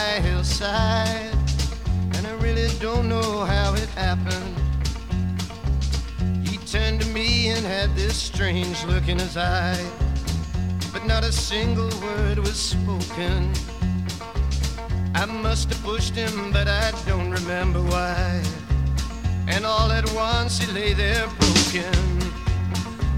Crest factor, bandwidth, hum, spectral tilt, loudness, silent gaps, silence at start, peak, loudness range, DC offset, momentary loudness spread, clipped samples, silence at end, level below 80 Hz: 18 dB; 15.5 kHz; none; -4.5 dB/octave; -23 LUFS; none; 0 s; -4 dBFS; 4 LU; 0.4%; 6 LU; under 0.1%; 0 s; -26 dBFS